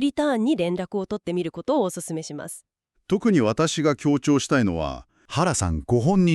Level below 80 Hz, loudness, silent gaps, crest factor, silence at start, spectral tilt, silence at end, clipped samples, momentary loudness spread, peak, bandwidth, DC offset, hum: -46 dBFS; -23 LUFS; none; 16 dB; 0 s; -5.5 dB/octave; 0 s; under 0.1%; 11 LU; -8 dBFS; 13 kHz; under 0.1%; none